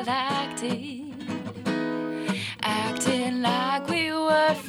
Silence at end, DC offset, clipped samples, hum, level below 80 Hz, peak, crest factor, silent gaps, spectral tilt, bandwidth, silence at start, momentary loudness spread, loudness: 0 s; under 0.1%; under 0.1%; none; -68 dBFS; -8 dBFS; 18 dB; none; -4 dB/octave; 19.5 kHz; 0 s; 11 LU; -26 LUFS